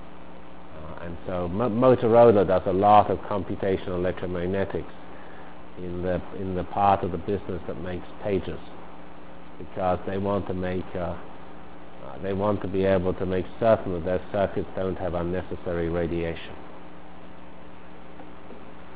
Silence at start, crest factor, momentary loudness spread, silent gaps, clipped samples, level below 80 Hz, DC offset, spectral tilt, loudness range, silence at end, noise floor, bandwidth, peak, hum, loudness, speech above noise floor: 0 s; 22 dB; 25 LU; none; under 0.1%; -46 dBFS; 2%; -11 dB/octave; 10 LU; 0 s; -46 dBFS; 4 kHz; -4 dBFS; none; -25 LUFS; 21 dB